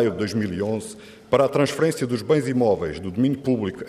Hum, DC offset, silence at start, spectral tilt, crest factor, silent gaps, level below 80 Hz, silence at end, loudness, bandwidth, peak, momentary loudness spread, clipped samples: none; under 0.1%; 0 s; -6.5 dB/octave; 16 dB; none; -56 dBFS; 0 s; -22 LUFS; 15 kHz; -6 dBFS; 8 LU; under 0.1%